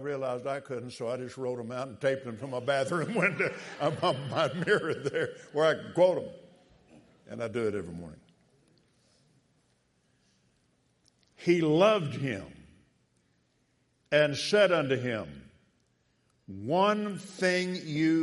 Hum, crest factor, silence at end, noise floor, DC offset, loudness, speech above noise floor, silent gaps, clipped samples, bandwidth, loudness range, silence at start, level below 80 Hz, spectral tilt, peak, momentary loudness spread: none; 22 dB; 0 s; -72 dBFS; under 0.1%; -29 LUFS; 43 dB; none; under 0.1%; 11.5 kHz; 11 LU; 0 s; -70 dBFS; -5.5 dB/octave; -10 dBFS; 13 LU